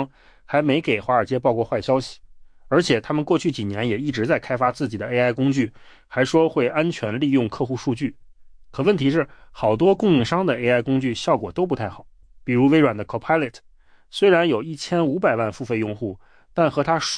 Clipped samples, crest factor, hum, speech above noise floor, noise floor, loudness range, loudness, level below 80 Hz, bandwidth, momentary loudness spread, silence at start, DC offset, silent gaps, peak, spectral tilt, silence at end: under 0.1%; 16 dB; none; 24 dB; -45 dBFS; 2 LU; -21 LUFS; -52 dBFS; 10.5 kHz; 9 LU; 0 s; under 0.1%; none; -6 dBFS; -6 dB/octave; 0 s